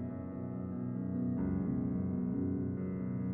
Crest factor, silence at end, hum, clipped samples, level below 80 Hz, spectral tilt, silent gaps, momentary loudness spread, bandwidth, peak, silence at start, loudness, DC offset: 12 dB; 0 s; none; under 0.1%; -56 dBFS; -13 dB/octave; none; 6 LU; 2.7 kHz; -24 dBFS; 0 s; -37 LUFS; under 0.1%